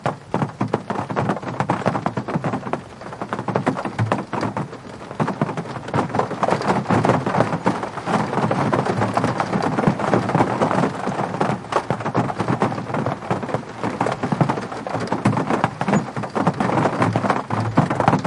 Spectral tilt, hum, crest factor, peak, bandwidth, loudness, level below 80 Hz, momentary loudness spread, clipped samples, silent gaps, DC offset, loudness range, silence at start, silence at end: -7 dB/octave; none; 20 dB; -2 dBFS; 11.5 kHz; -22 LUFS; -54 dBFS; 7 LU; under 0.1%; none; under 0.1%; 4 LU; 0 s; 0 s